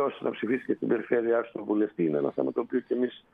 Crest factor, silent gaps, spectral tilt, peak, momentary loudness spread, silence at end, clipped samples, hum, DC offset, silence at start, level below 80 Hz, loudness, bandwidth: 16 dB; none; -9.5 dB/octave; -12 dBFS; 4 LU; 0.15 s; under 0.1%; none; under 0.1%; 0 s; -76 dBFS; -29 LUFS; 3.9 kHz